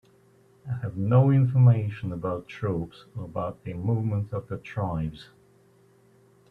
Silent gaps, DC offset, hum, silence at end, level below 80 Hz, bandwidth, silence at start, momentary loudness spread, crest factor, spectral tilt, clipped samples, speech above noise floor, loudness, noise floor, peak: none; under 0.1%; none; 1.25 s; -54 dBFS; 4.5 kHz; 0.65 s; 16 LU; 18 dB; -10 dB/octave; under 0.1%; 34 dB; -26 LUFS; -59 dBFS; -8 dBFS